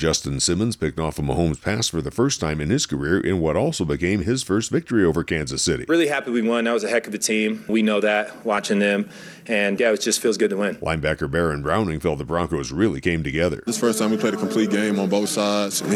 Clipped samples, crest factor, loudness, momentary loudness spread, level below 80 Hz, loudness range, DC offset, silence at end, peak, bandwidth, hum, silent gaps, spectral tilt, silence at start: under 0.1%; 14 dB; -22 LUFS; 4 LU; -42 dBFS; 1 LU; under 0.1%; 0 s; -6 dBFS; 15 kHz; none; none; -4.5 dB/octave; 0 s